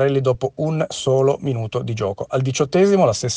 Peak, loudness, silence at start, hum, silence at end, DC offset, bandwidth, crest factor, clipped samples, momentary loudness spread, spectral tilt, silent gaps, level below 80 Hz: -4 dBFS; -19 LUFS; 0 s; none; 0 s; under 0.1%; 9.8 kHz; 14 dB; under 0.1%; 9 LU; -6 dB/octave; none; -52 dBFS